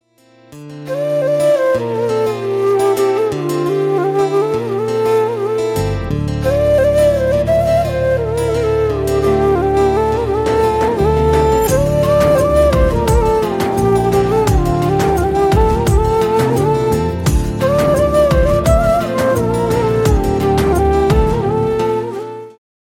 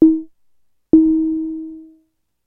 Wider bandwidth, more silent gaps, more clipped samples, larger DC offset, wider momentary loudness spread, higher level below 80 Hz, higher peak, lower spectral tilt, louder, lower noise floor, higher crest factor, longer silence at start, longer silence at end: first, 16.5 kHz vs 1.2 kHz; neither; neither; neither; second, 5 LU vs 17 LU; first, -24 dBFS vs -46 dBFS; about the same, -2 dBFS vs 0 dBFS; second, -6.5 dB/octave vs -12.5 dB/octave; about the same, -14 LUFS vs -16 LUFS; second, -48 dBFS vs -63 dBFS; second, 12 dB vs 18 dB; first, 0.5 s vs 0 s; second, 0.45 s vs 0.65 s